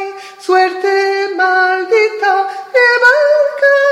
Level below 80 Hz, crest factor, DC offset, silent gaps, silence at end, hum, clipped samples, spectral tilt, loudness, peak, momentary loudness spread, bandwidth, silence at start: -64 dBFS; 12 dB; under 0.1%; none; 0 s; none; under 0.1%; -1 dB/octave; -11 LUFS; 0 dBFS; 7 LU; 13 kHz; 0 s